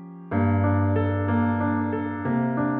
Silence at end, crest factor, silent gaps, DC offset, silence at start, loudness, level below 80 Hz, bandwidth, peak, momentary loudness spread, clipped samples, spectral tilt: 0 s; 12 dB; none; under 0.1%; 0 s; -24 LUFS; -58 dBFS; 3.8 kHz; -12 dBFS; 5 LU; under 0.1%; -9 dB/octave